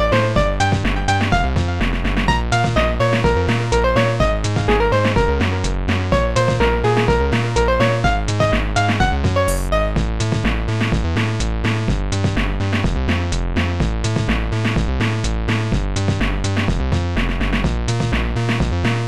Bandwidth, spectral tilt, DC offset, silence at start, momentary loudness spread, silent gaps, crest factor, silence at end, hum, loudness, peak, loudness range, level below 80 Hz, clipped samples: 13 kHz; -6 dB/octave; 2%; 0 s; 4 LU; none; 12 dB; 0 s; none; -18 LUFS; -4 dBFS; 3 LU; -24 dBFS; under 0.1%